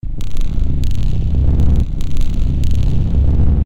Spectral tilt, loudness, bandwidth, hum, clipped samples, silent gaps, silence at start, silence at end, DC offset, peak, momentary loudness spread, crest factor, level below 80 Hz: -8 dB/octave; -18 LUFS; 7.8 kHz; none; under 0.1%; none; 0 s; 0 s; 4%; -2 dBFS; 7 LU; 10 dB; -14 dBFS